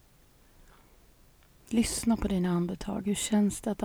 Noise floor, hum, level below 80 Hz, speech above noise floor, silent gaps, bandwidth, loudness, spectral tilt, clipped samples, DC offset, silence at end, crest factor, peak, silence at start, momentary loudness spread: -60 dBFS; none; -48 dBFS; 32 dB; none; over 20 kHz; -29 LUFS; -5 dB/octave; under 0.1%; under 0.1%; 0 s; 16 dB; -16 dBFS; 1.7 s; 5 LU